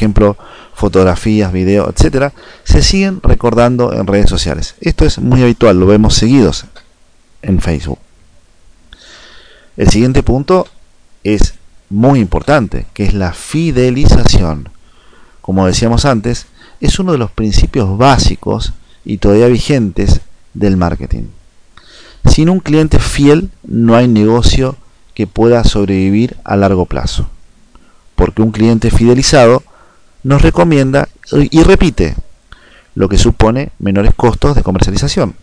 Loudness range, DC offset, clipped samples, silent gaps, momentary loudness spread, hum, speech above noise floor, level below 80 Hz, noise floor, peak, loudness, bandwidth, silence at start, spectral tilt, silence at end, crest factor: 4 LU; under 0.1%; under 0.1%; none; 11 LU; none; 36 dB; -18 dBFS; -45 dBFS; 0 dBFS; -11 LUFS; 10.5 kHz; 0 s; -6 dB/octave; 0.05 s; 10 dB